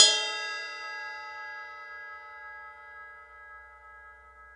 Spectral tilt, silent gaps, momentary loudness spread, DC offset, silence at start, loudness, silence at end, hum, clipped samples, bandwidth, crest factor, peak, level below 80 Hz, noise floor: 3 dB/octave; none; 18 LU; under 0.1%; 0 s; -31 LUFS; 0 s; none; under 0.1%; 11.5 kHz; 32 dB; -2 dBFS; -70 dBFS; -52 dBFS